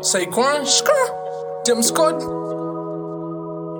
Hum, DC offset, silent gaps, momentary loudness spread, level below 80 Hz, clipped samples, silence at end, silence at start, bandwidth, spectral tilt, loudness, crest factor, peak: none; under 0.1%; none; 13 LU; -60 dBFS; under 0.1%; 0 s; 0 s; 19 kHz; -2.5 dB/octave; -20 LUFS; 18 dB; -2 dBFS